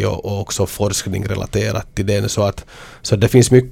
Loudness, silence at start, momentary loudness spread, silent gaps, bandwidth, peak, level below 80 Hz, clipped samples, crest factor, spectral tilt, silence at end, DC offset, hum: -18 LUFS; 0 s; 11 LU; none; 17 kHz; 0 dBFS; -38 dBFS; under 0.1%; 16 dB; -5.5 dB/octave; 0 s; under 0.1%; none